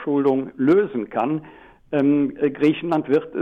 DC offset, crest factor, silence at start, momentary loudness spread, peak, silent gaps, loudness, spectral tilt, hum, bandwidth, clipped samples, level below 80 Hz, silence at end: under 0.1%; 12 dB; 0 s; 7 LU; -8 dBFS; none; -21 LUFS; -8.5 dB/octave; none; 5.4 kHz; under 0.1%; -58 dBFS; 0 s